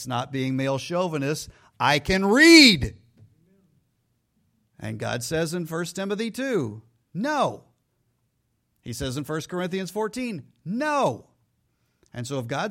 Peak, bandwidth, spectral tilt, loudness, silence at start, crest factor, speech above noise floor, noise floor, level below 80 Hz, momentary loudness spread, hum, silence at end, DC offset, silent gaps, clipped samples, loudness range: -2 dBFS; 16 kHz; -4 dB/octave; -22 LUFS; 0 s; 24 dB; 50 dB; -73 dBFS; -50 dBFS; 19 LU; none; 0 s; under 0.1%; none; under 0.1%; 13 LU